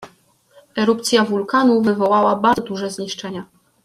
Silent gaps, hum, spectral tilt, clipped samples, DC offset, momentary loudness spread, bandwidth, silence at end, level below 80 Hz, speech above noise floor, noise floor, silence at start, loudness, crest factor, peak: none; none; -4.5 dB/octave; under 0.1%; under 0.1%; 13 LU; 14 kHz; 0.4 s; -60 dBFS; 37 dB; -55 dBFS; 0 s; -18 LUFS; 16 dB; -2 dBFS